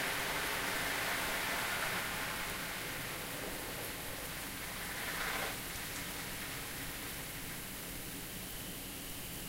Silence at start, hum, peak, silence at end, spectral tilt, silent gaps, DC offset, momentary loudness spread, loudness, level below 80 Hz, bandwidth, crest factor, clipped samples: 0 s; none; -24 dBFS; 0 s; -2 dB/octave; none; under 0.1%; 8 LU; -38 LUFS; -56 dBFS; 16 kHz; 16 dB; under 0.1%